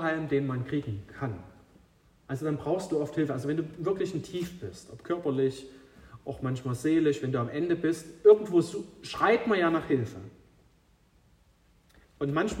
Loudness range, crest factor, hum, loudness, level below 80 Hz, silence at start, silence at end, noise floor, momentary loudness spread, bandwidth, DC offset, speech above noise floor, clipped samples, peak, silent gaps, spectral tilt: 7 LU; 22 dB; none; -29 LUFS; -60 dBFS; 0 s; 0 s; -64 dBFS; 16 LU; 15 kHz; under 0.1%; 35 dB; under 0.1%; -8 dBFS; none; -7 dB/octave